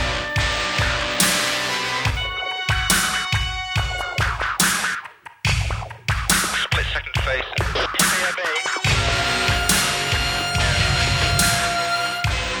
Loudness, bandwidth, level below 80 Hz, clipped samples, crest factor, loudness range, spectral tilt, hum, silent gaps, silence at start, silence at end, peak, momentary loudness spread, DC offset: -20 LUFS; over 20 kHz; -32 dBFS; under 0.1%; 20 dB; 3 LU; -2.5 dB/octave; none; none; 0 s; 0 s; 0 dBFS; 6 LU; under 0.1%